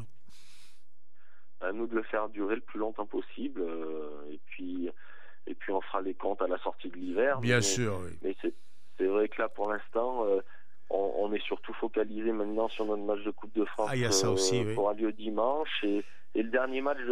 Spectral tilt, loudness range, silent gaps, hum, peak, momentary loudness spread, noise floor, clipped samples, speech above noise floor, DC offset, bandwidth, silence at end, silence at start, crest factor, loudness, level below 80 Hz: -4 dB/octave; 7 LU; none; none; -12 dBFS; 11 LU; -73 dBFS; under 0.1%; 41 dB; 2%; 15.5 kHz; 0 s; 0 s; 20 dB; -32 LUFS; -68 dBFS